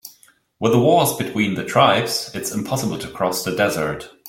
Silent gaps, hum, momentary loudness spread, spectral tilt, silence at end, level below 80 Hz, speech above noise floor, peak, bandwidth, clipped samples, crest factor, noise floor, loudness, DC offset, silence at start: none; none; 10 LU; -4.5 dB/octave; 0 s; -54 dBFS; 35 dB; -2 dBFS; 17 kHz; under 0.1%; 18 dB; -54 dBFS; -19 LUFS; under 0.1%; 0.05 s